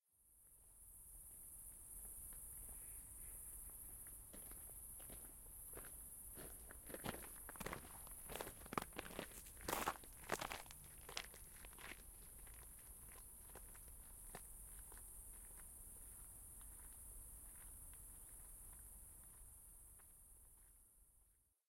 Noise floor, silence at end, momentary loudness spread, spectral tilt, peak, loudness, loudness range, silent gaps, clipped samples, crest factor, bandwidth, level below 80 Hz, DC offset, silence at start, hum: -77 dBFS; 0.25 s; 12 LU; -2.5 dB/octave; -22 dBFS; -53 LUFS; 8 LU; none; under 0.1%; 32 dB; 16.5 kHz; -64 dBFS; under 0.1%; 0.1 s; none